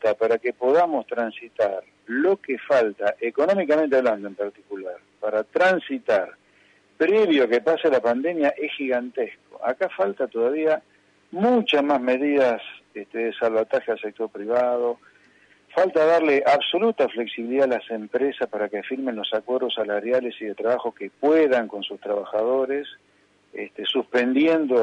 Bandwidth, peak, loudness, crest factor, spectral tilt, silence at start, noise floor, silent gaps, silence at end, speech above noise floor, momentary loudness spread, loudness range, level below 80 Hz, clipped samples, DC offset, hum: 8.8 kHz; -8 dBFS; -23 LUFS; 14 dB; -5.5 dB/octave; 0 s; -58 dBFS; none; 0 s; 36 dB; 12 LU; 3 LU; -76 dBFS; under 0.1%; under 0.1%; 50 Hz at -65 dBFS